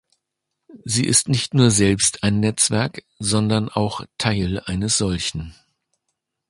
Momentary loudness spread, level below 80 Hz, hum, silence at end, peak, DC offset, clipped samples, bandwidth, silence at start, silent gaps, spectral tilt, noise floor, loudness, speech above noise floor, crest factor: 10 LU; -42 dBFS; none; 0.95 s; -2 dBFS; under 0.1%; under 0.1%; 11.5 kHz; 0.7 s; none; -4 dB/octave; -80 dBFS; -19 LUFS; 60 dB; 20 dB